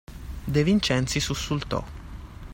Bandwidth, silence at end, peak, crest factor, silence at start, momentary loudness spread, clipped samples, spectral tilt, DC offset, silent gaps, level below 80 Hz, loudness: 16.5 kHz; 0 s; -10 dBFS; 18 dB; 0.1 s; 20 LU; under 0.1%; -5 dB/octave; under 0.1%; none; -40 dBFS; -25 LUFS